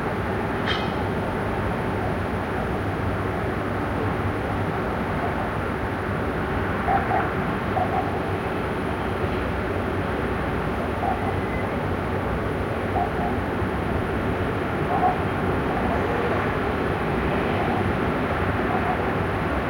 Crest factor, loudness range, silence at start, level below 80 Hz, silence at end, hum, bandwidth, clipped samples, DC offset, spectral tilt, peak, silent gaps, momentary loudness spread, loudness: 14 dB; 2 LU; 0 s; -36 dBFS; 0 s; none; 16.5 kHz; under 0.1%; under 0.1%; -7.5 dB/octave; -10 dBFS; none; 3 LU; -25 LUFS